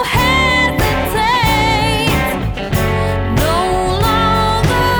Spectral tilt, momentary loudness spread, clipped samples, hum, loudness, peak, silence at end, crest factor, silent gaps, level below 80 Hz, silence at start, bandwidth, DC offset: -5 dB/octave; 5 LU; under 0.1%; none; -14 LUFS; -2 dBFS; 0 s; 12 dB; none; -24 dBFS; 0 s; over 20 kHz; under 0.1%